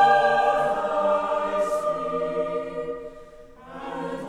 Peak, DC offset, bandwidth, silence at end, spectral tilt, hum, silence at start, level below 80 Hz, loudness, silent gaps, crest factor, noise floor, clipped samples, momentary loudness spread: -8 dBFS; under 0.1%; 12.5 kHz; 0 s; -4.5 dB/octave; none; 0 s; -54 dBFS; -24 LUFS; none; 16 dB; -45 dBFS; under 0.1%; 16 LU